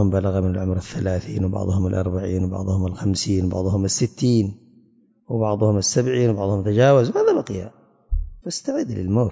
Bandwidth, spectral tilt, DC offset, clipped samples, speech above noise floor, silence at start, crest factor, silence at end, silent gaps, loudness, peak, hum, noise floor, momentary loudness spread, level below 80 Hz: 8 kHz; -6 dB/octave; under 0.1%; under 0.1%; 37 dB; 0 s; 16 dB; 0 s; none; -21 LUFS; -4 dBFS; none; -57 dBFS; 11 LU; -34 dBFS